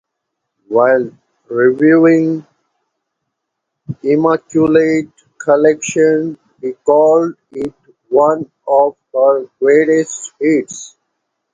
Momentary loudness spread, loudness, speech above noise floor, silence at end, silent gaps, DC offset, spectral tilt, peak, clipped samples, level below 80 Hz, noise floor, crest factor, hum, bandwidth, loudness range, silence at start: 15 LU; -13 LUFS; 63 dB; 0.65 s; none; under 0.1%; -6 dB/octave; 0 dBFS; under 0.1%; -58 dBFS; -75 dBFS; 14 dB; none; 9.4 kHz; 2 LU; 0.7 s